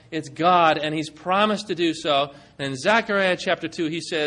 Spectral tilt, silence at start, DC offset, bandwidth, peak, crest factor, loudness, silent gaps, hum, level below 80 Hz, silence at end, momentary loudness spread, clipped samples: -4.5 dB/octave; 0.1 s; under 0.1%; 11 kHz; -6 dBFS; 18 dB; -22 LUFS; none; none; -64 dBFS; 0 s; 11 LU; under 0.1%